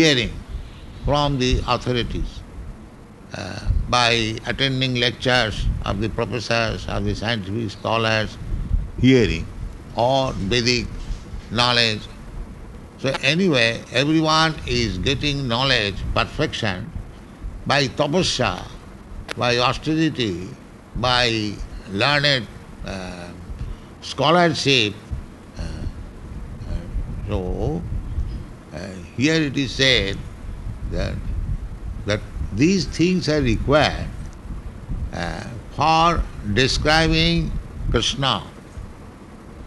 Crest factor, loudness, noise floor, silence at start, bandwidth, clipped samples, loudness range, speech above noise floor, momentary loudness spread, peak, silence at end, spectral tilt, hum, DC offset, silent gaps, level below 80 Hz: 20 dB; -20 LUFS; -41 dBFS; 0 s; 12.5 kHz; under 0.1%; 4 LU; 21 dB; 20 LU; -2 dBFS; 0 s; -4.5 dB/octave; none; under 0.1%; none; -32 dBFS